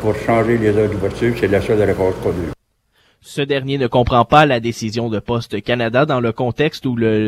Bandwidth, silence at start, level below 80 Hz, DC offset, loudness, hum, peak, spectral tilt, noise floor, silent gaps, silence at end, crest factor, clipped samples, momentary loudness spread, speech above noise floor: 15 kHz; 0 s; -38 dBFS; under 0.1%; -17 LUFS; none; 0 dBFS; -6.5 dB/octave; -60 dBFS; none; 0 s; 16 dB; under 0.1%; 9 LU; 44 dB